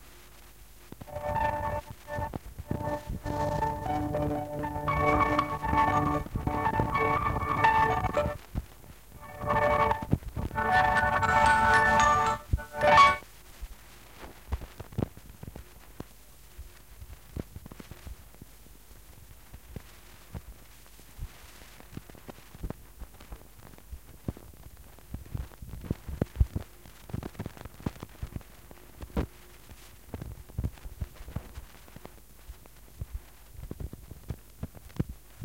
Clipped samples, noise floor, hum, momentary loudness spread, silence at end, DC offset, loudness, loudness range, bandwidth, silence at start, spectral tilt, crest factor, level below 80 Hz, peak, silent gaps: under 0.1%; -54 dBFS; none; 26 LU; 0 s; 0.2%; -28 LUFS; 23 LU; 17 kHz; 0 s; -5.5 dB/octave; 24 dB; -42 dBFS; -8 dBFS; none